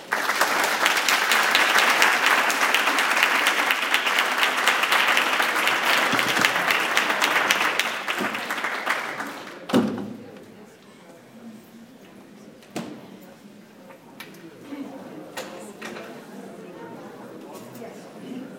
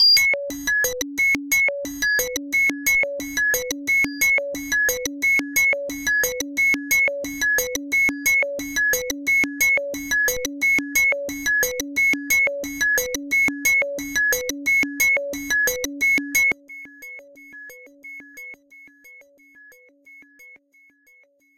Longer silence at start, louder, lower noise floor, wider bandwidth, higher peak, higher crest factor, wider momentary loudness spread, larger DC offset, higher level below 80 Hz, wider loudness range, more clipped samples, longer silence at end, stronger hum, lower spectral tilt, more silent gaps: about the same, 0 s vs 0 s; about the same, -20 LUFS vs -19 LUFS; second, -47 dBFS vs -58 dBFS; about the same, 17 kHz vs 17 kHz; first, 0 dBFS vs -6 dBFS; first, 24 dB vs 16 dB; first, 22 LU vs 6 LU; neither; second, -72 dBFS vs -50 dBFS; first, 23 LU vs 3 LU; neither; second, 0 s vs 1 s; neither; about the same, -1.5 dB/octave vs -0.5 dB/octave; neither